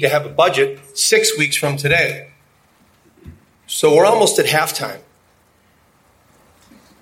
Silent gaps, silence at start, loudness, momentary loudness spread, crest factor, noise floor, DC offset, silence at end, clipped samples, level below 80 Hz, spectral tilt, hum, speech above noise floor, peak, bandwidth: none; 0 s; -15 LUFS; 13 LU; 18 dB; -56 dBFS; under 0.1%; 2.05 s; under 0.1%; -54 dBFS; -3 dB/octave; none; 40 dB; 0 dBFS; 16.5 kHz